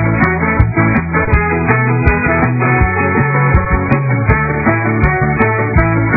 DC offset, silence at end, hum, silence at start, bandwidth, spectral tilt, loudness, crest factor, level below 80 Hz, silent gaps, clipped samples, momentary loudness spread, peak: under 0.1%; 0 s; none; 0 s; 3.9 kHz; -12 dB/octave; -12 LUFS; 12 dB; -22 dBFS; none; under 0.1%; 1 LU; 0 dBFS